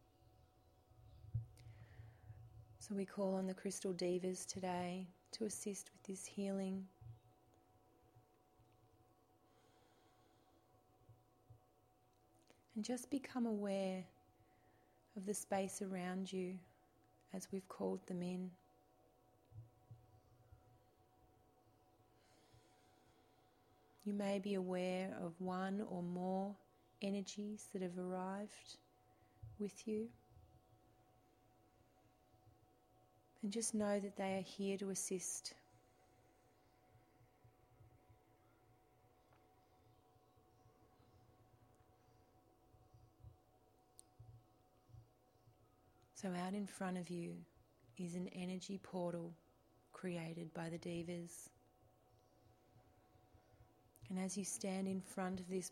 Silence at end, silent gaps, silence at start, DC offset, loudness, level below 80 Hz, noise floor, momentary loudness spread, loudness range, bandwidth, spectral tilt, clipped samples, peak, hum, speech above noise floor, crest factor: 0 s; none; 0.95 s; under 0.1%; -45 LUFS; -78 dBFS; -75 dBFS; 20 LU; 11 LU; 16 kHz; -5 dB/octave; under 0.1%; -28 dBFS; none; 30 dB; 20 dB